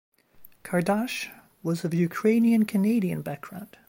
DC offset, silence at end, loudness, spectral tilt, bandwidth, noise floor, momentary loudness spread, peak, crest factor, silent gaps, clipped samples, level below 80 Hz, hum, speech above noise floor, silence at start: under 0.1%; 0.25 s; -25 LUFS; -6.5 dB/octave; 16.5 kHz; -53 dBFS; 16 LU; -12 dBFS; 14 dB; none; under 0.1%; -68 dBFS; none; 28 dB; 0.4 s